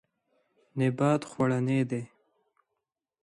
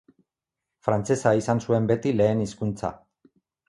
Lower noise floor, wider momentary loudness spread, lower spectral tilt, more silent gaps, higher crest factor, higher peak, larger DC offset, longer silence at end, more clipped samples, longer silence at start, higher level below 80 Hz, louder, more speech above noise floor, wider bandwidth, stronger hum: about the same, -86 dBFS vs -87 dBFS; first, 12 LU vs 9 LU; about the same, -7.5 dB/octave vs -7 dB/octave; neither; about the same, 18 dB vs 20 dB; second, -12 dBFS vs -6 dBFS; neither; first, 1.15 s vs 0.75 s; neither; about the same, 0.75 s vs 0.85 s; second, -70 dBFS vs -54 dBFS; second, -28 LUFS vs -24 LUFS; second, 59 dB vs 63 dB; about the same, 11.5 kHz vs 11.5 kHz; neither